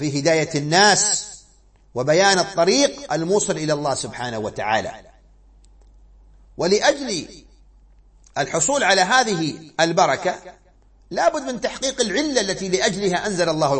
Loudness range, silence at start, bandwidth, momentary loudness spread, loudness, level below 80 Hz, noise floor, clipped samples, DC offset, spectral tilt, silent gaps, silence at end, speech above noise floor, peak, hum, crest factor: 7 LU; 0 s; 8.8 kHz; 11 LU; -19 LUFS; -52 dBFS; -53 dBFS; under 0.1%; under 0.1%; -3 dB/octave; none; 0 s; 33 dB; -2 dBFS; none; 20 dB